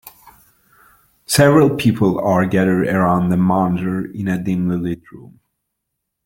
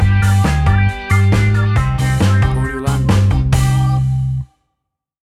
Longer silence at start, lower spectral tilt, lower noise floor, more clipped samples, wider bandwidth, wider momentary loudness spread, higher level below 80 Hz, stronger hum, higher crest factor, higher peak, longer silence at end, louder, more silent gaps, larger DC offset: about the same, 0.05 s vs 0 s; about the same, -6.5 dB/octave vs -6.5 dB/octave; about the same, -77 dBFS vs -76 dBFS; neither; first, 17 kHz vs 13 kHz; first, 11 LU vs 5 LU; second, -50 dBFS vs -24 dBFS; neither; about the same, 16 dB vs 12 dB; about the same, -2 dBFS vs -2 dBFS; first, 1.05 s vs 0.85 s; about the same, -16 LUFS vs -14 LUFS; neither; neither